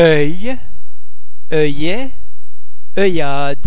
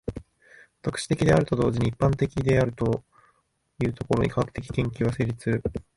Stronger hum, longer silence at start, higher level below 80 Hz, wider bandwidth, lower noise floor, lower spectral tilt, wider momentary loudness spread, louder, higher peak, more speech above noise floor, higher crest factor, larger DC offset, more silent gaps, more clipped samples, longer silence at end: neither; about the same, 0 s vs 0.05 s; about the same, -44 dBFS vs -44 dBFS; second, 4 kHz vs 11.5 kHz; second, -47 dBFS vs -69 dBFS; first, -9.5 dB/octave vs -7 dB/octave; about the same, 11 LU vs 10 LU; first, -17 LUFS vs -26 LUFS; first, 0 dBFS vs -8 dBFS; second, 33 dB vs 44 dB; about the same, 20 dB vs 18 dB; first, 50% vs under 0.1%; neither; neither; second, 0 s vs 0.15 s